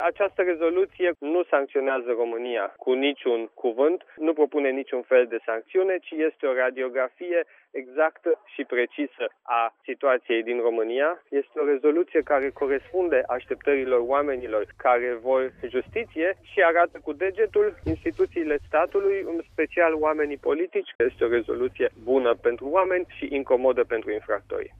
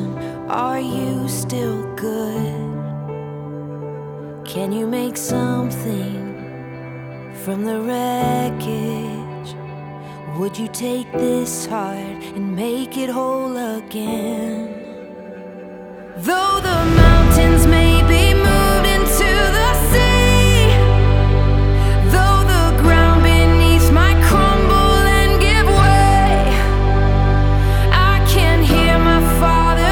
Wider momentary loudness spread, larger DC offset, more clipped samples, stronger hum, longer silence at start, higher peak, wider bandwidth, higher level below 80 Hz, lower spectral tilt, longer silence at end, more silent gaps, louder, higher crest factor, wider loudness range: second, 7 LU vs 19 LU; neither; neither; neither; about the same, 0 s vs 0 s; second, -6 dBFS vs 0 dBFS; second, 3.8 kHz vs 18 kHz; second, -56 dBFS vs -18 dBFS; first, -7.5 dB/octave vs -5.5 dB/octave; about the same, 0.1 s vs 0 s; first, 20.95-20.99 s vs none; second, -25 LUFS vs -15 LUFS; about the same, 18 dB vs 14 dB; second, 2 LU vs 11 LU